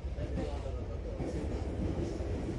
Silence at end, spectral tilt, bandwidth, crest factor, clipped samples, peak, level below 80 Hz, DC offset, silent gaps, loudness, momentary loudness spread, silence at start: 0 s; -7.5 dB/octave; 11 kHz; 12 dB; under 0.1%; -22 dBFS; -40 dBFS; under 0.1%; none; -38 LUFS; 4 LU; 0 s